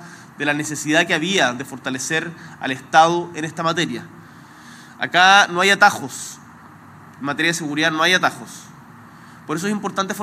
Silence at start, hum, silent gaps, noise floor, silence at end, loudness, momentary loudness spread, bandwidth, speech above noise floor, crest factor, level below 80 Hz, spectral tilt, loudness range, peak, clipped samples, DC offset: 0 s; none; none; -43 dBFS; 0 s; -18 LUFS; 17 LU; 16 kHz; 24 dB; 20 dB; -68 dBFS; -3 dB/octave; 5 LU; 0 dBFS; under 0.1%; under 0.1%